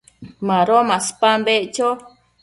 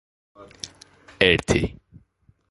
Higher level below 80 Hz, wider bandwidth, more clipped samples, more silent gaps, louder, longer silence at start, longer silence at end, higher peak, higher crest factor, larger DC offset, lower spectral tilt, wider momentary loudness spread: second, -62 dBFS vs -42 dBFS; about the same, 11.5 kHz vs 11.5 kHz; neither; neither; first, -17 LUFS vs -21 LUFS; second, 0.2 s vs 0.4 s; second, 0.4 s vs 0.8 s; about the same, -2 dBFS vs 0 dBFS; second, 16 dB vs 26 dB; neither; about the same, -3.5 dB/octave vs -4.5 dB/octave; second, 8 LU vs 20 LU